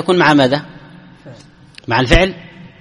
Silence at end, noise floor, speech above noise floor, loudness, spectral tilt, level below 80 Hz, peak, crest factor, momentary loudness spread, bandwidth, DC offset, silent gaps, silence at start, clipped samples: 0.15 s; -41 dBFS; 29 dB; -13 LUFS; -5.5 dB/octave; -26 dBFS; 0 dBFS; 16 dB; 23 LU; 11.5 kHz; under 0.1%; none; 0 s; under 0.1%